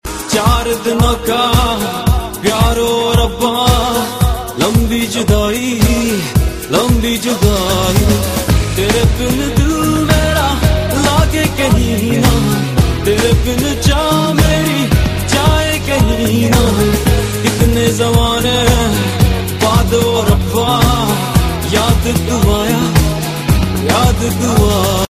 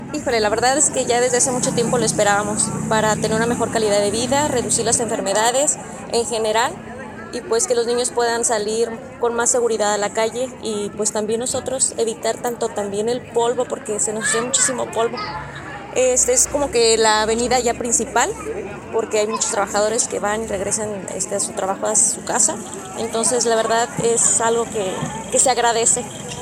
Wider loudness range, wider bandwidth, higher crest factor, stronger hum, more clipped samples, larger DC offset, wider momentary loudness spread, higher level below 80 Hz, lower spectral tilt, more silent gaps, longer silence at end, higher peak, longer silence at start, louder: second, 1 LU vs 4 LU; about the same, 15.5 kHz vs 16.5 kHz; second, 12 dB vs 18 dB; neither; neither; neither; second, 3 LU vs 9 LU; first, -20 dBFS vs -48 dBFS; first, -5 dB/octave vs -2.5 dB/octave; neither; about the same, 0.05 s vs 0 s; about the same, 0 dBFS vs 0 dBFS; about the same, 0.05 s vs 0 s; first, -13 LUFS vs -18 LUFS